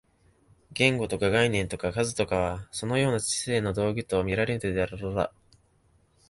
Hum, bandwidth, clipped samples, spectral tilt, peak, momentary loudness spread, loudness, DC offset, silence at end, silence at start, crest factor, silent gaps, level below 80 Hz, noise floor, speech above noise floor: none; 11.5 kHz; under 0.1%; -4.5 dB/octave; -6 dBFS; 7 LU; -27 LUFS; under 0.1%; 1 s; 0.7 s; 22 dB; none; -48 dBFS; -65 dBFS; 38 dB